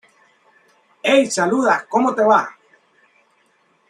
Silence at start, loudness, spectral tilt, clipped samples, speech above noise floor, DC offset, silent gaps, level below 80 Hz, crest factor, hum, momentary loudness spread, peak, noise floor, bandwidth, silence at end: 1.05 s; -17 LUFS; -3.5 dB/octave; under 0.1%; 44 dB; under 0.1%; none; -74 dBFS; 18 dB; none; 5 LU; -2 dBFS; -60 dBFS; 13.5 kHz; 1.4 s